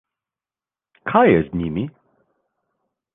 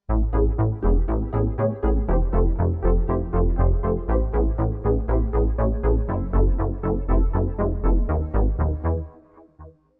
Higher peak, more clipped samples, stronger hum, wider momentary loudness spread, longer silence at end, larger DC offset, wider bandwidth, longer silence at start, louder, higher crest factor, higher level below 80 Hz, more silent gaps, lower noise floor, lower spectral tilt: first, -2 dBFS vs -8 dBFS; neither; neither; first, 17 LU vs 3 LU; first, 1.25 s vs 0.3 s; neither; first, 3.9 kHz vs 2.4 kHz; first, 1.05 s vs 0.1 s; first, -18 LUFS vs -23 LUFS; first, 20 dB vs 12 dB; second, -48 dBFS vs -22 dBFS; neither; first, under -90 dBFS vs -50 dBFS; second, -10.5 dB/octave vs -13 dB/octave